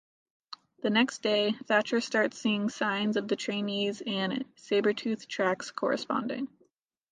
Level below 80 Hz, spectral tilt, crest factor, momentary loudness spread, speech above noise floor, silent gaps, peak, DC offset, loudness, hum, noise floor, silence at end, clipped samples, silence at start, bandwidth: -78 dBFS; -4.5 dB/octave; 20 dB; 9 LU; 40 dB; none; -10 dBFS; under 0.1%; -29 LUFS; none; -70 dBFS; 0.65 s; under 0.1%; 0.5 s; 9.6 kHz